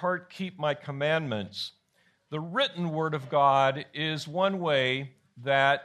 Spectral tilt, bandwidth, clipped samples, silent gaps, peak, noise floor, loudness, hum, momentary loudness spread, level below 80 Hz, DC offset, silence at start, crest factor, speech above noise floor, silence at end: -5.5 dB/octave; 13 kHz; under 0.1%; none; -10 dBFS; -69 dBFS; -28 LUFS; none; 14 LU; -74 dBFS; under 0.1%; 0 s; 20 dB; 41 dB; 0 s